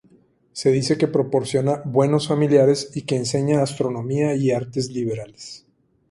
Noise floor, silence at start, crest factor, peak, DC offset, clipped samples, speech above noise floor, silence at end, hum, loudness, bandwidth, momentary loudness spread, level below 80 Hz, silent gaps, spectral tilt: -56 dBFS; 0.55 s; 18 dB; -4 dBFS; under 0.1%; under 0.1%; 36 dB; 0.55 s; none; -21 LUFS; 11.5 kHz; 10 LU; -58 dBFS; none; -6 dB/octave